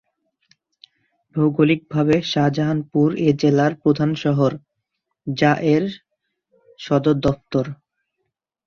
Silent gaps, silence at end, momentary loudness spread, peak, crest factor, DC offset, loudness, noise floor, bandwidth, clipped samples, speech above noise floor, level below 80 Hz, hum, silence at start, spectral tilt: none; 0.95 s; 13 LU; -2 dBFS; 18 dB; under 0.1%; -19 LUFS; -77 dBFS; 7 kHz; under 0.1%; 59 dB; -54 dBFS; none; 1.35 s; -7.5 dB/octave